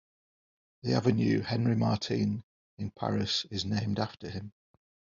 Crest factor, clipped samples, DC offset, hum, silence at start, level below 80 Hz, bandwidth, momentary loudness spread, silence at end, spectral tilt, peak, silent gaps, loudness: 20 dB; under 0.1%; under 0.1%; none; 0.85 s; -64 dBFS; 7.4 kHz; 13 LU; 0.7 s; -5.5 dB/octave; -12 dBFS; 2.43-2.77 s; -31 LUFS